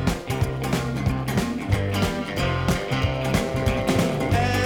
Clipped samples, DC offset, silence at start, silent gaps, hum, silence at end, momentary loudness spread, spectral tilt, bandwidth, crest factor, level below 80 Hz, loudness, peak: under 0.1%; 0.2%; 0 s; none; none; 0 s; 3 LU; -6 dB/octave; 19.5 kHz; 16 dB; -34 dBFS; -24 LUFS; -8 dBFS